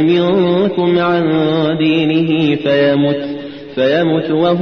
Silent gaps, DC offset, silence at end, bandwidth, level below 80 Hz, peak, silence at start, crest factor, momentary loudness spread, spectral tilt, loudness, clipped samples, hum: none; 0.2%; 0 s; 6.2 kHz; -52 dBFS; -4 dBFS; 0 s; 10 dB; 5 LU; -8.5 dB/octave; -13 LUFS; under 0.1%; none